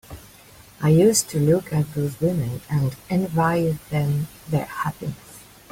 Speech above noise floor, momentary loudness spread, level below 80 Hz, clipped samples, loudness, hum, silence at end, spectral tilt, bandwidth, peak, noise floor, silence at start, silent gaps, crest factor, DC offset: 26 dB; 12 LU; -50 dBFS; under 0.1%; -22 LUFS; none; 0.3 s; -6 dB/octave; 16.5 kHz; -6 dBFS; -48 dBFS; 0.1 s; none; 16 dB; under 0.1%